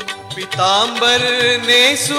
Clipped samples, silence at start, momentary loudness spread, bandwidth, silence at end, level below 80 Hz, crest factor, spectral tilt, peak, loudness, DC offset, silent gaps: under 0.1%; 0 s; 14 LU; 16.5 kHz; 0 s; -56 dBFS; 12 dB; -1.5 dB/octave; -4 dBFS; -12 LUFS; under 0.1%; none